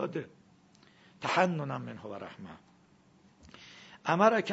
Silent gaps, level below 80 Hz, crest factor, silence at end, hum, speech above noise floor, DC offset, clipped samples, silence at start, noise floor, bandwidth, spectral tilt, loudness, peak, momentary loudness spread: none; -74 dBFS; 26 dB; 0 s; none; 32 dB; under 0.1%; under 0.1%; 0 s; -63 dBFS; 7.6 kHz; -4 dB/octave; -31 LUFS; -8 dBFS; 25 LU